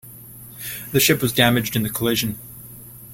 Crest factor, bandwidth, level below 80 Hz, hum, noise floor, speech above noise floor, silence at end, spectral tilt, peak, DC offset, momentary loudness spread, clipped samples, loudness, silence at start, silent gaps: 20 dB; 16.5 kHz; -50 dBFS; none; -41 dBFS; 21 dB; 0 s; -4 dB/octave; -2 dBFS; under 0.1%; 22 LU; under 0.1%; -19 LUFS; 0.05 s; none